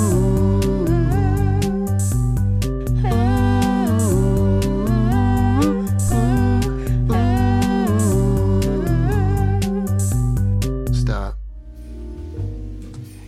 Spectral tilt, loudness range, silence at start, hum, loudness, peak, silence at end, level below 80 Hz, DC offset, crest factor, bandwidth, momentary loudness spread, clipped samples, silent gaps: -7 dB/octave; 4 LU; 0 s; none; -19 LUFS; -4 dBFS; 0 s; -24 dBFS; 0.2%; 12 dB; 15 kHz; 12 LU; under 0.1%; none